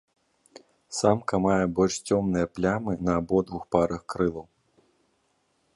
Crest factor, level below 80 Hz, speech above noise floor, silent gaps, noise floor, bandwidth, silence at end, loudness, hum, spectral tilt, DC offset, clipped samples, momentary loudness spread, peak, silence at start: 22 dB; -50 dBFS; 46 dB; none; -71 dBFS; 11.5 kHz; 1.35 s; -26 LUFS; none; -6 dB/octave; under 0.1%; under 0.1%; 5 LU; -6 dBFS; 0.9 s